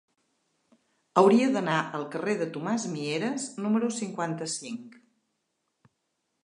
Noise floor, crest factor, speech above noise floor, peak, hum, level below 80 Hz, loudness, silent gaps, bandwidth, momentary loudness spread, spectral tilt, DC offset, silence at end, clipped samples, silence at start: -79 dBFS; 24 dB; 52 dB; -6 dBFS; none; -82 dBFS; -27 LUFS; none; 11 kHz; 12 LU; -5 dB/octave; under 0.1%; 1.55 s; under 0.1%; 1.15 s